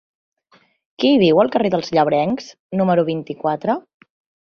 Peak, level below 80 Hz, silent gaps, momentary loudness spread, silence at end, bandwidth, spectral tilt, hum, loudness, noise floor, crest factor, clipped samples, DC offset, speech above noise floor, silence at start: -2 dBFS; -60 dBFS; 2.60-2.69 s; 9 LU; 0.8 s; 7 kHz; -7 dB/octave; none; -18 LUFS; -57 dBFS; 16 dB; under 0.1%; under 0.1%; 40 dB; 1 s